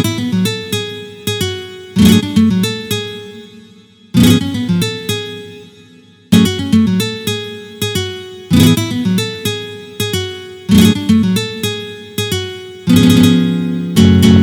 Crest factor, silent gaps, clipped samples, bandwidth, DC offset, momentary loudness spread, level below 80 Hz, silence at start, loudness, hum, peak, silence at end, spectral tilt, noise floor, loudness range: 14 dB; none; 0.2%; over 20 kHz; under 0.1%; 15 LU; -40 dBFS; 0 s; -14 LUFS; none; 0 dBFS; 0 s; -5.5 dB/octave; -43 dBFS; 4 LU